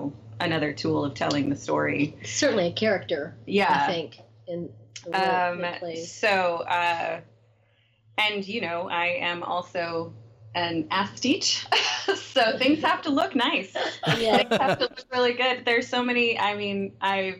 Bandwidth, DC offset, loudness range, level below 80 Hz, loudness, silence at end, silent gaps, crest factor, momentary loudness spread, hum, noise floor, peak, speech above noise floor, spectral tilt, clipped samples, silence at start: 15 kHz; under 0.1%; 4 LU; -64 dBFS; -25 LUFS; 0 s; none; 18 dB; 10 LU; none; -64 dBFS; -6 dBFS; 38 dB; -3.5 dB/octave; under 0.1%; 0 s